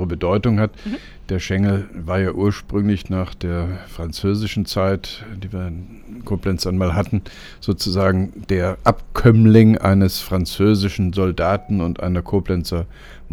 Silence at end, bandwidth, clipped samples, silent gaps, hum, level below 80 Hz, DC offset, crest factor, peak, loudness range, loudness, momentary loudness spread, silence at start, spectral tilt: 0 s; 17.5 kHz; under 0.1%; none; none; -34 dBFS; under 0.1%; 18 dB; 0 dBFS; 8 LU; -19 LUFS; 15 LU; 0 s; -7 dB/octave